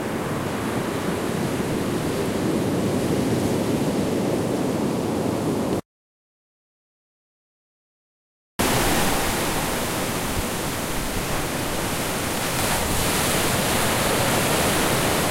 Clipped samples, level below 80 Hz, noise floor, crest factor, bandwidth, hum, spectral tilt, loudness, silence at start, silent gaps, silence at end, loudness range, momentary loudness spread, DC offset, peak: under 0.1%; -38 dBFS; under -90 dBFS; 16 dB; 16 kHz; none; -4 dB/octave; -23 LUFS; 0 s; 5.85-8.59 s; 0 s; 7 LU; 6 LU; under 0.1%; -8 dBFS